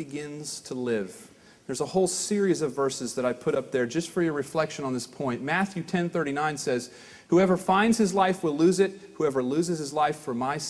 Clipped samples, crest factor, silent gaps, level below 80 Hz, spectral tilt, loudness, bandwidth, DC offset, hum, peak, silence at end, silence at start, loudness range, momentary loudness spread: under 0.1%; 18 dB; none; -64 dBFS; -5 dB/octave; -27 LUFS; 11 kHz; under 0.1%; none; -10 dBFS; 0 s; 0 s; 4 LU; 10 LU